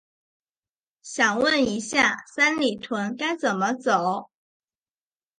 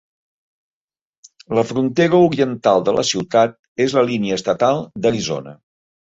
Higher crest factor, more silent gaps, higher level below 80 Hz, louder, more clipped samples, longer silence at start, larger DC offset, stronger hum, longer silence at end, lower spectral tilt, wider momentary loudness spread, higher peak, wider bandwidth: about the same, 18 dB vs 16 dB; second, none vs 3.59-3.75 s; second, -64 dBFS vs -56 dBFS; second, -23 LUFS vs -18 LUFS; neither; second, 1.05 s vs 1.5 s; neither; neither; first, 1.15 s vs 0.5 s; second, -3 dB/octave vs -5 dB/octave; about the same, 8 LU vs 7 LU; second, -6 dBFS vs -2 dBFS; first, 11 kHz vs 8 kHz